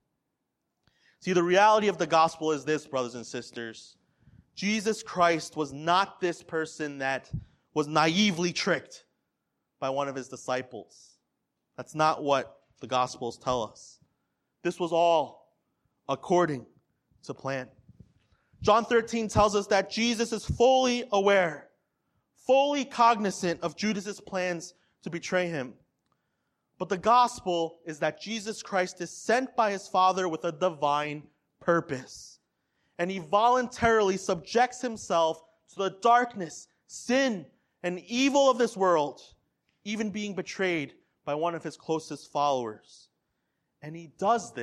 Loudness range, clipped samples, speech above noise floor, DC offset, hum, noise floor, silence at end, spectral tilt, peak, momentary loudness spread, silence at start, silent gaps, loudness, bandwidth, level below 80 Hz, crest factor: 6 LU; under 0.1%; 55 dB; under 0.1%; none; -82 dBFS; 0 s; -4.5 dB/octave; -8 dBFS; 16 LU; 1.25 s; none; -27 LUFS; 13 kHz; -58 dBFS; 20 dB